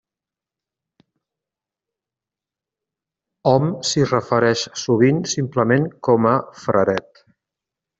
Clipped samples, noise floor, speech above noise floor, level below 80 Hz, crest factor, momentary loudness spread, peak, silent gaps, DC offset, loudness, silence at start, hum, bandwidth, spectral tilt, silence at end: under 0.1%; -88 dBFS; 71 dB; -60 dBFS; 18 dB; 5 LU; -2 dBFS; none; under 0.1%; -19 LUFS; 3.45 s; none; 8.2 kHz; -5.5 dB/octave; 1 s